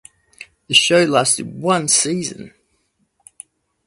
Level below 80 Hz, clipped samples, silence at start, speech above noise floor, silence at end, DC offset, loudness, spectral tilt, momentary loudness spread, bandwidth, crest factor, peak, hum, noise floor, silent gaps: -62 dBFS; under 0.1%; 0.4 s; 49 dB; 1.4 s; under 0.1%; -15 LUFS; -2.5 dB/octave; 12 LU; 11.5 kHz; 20 dB; 0 dBFS; none; -66 dBFS; none